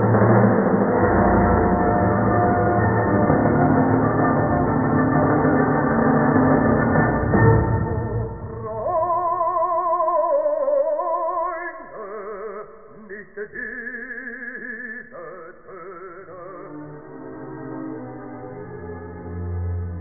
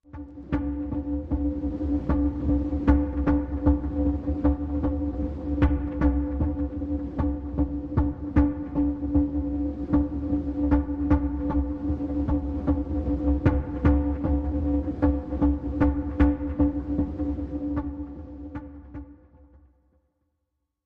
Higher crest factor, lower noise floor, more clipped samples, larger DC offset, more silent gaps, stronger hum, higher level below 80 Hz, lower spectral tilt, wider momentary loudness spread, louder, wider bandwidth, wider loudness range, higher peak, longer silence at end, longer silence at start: about the same, 16 dB vs 20 dB; second, -42 dBFS vs -79 dBFS; neither; first, 0.3% vs under 0.1%; neither; neither; second, -36 dBFS vs -30 dBFS; first, -15.5 dB/octave vs -11 dB/octave; first, 20 LU vs 7 LU; first, -19 LUFS vs -26 LUFS; second, 2.4 kHz vs 3.8 kHz; first, 17 LU vs 3 LU; about the same, -4 dBFS vs -6 dBFS; second, 0 s vs 1.7 s; about the same, 0 s vs 0.1 s